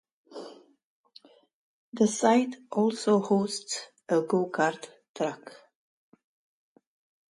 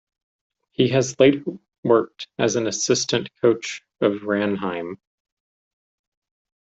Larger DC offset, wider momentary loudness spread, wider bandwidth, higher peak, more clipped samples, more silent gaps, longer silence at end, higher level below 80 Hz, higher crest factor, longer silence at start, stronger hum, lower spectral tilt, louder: neither; first, 22 LU vs 15 LU; first, 11.5 kHz vs 8.2 kHz; second, -8 dBFS vs -4 dBFS; neither; first, 0.84-1.04 s, 1.54-1.92 s, 5.08-5.14 s vs 1.78-1.83 s; about the same, 1.75 s vs 1.65 s; second, -78 dBFS vs -62 dBFS; about the same, 20 dB vs 20 dB; second, 0.3 s vs 0.8 s; neither; about the same, -5 dB/octave vs -4.5 dB/octave; second, -27 LUFS vs -21 LUFS